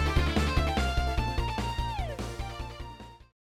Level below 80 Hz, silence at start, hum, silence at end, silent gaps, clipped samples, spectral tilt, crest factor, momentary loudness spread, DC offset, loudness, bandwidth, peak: -34 dBFS; 0 s; none; 0.35 s; none; under 0.1%; -5.5 dB/octave; 16 dB; 16 LU; under 0.1%; -31 LUFS; 15 kHz; -14 dBFS